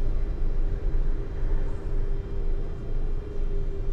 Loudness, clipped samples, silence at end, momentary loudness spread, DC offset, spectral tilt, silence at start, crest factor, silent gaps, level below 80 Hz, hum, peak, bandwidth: -33 LUFS; under 0.1%; 0 s; 3 LU; under 0.1%; -9 dB/octave; 0 s; 10 dB; none; -24 dBFS; none; -14 dBFS; 3.3 kHz